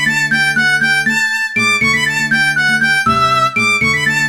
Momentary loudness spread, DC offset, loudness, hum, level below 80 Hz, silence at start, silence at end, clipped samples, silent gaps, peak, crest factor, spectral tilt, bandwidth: 2 LU; 0.4%; -12 LUFS; none; -46 dBFS; 0 s; 0 s; under 0.1%; none; -2 dBFS; 10 dB; -2.5 dB/octave; 17.5 kHz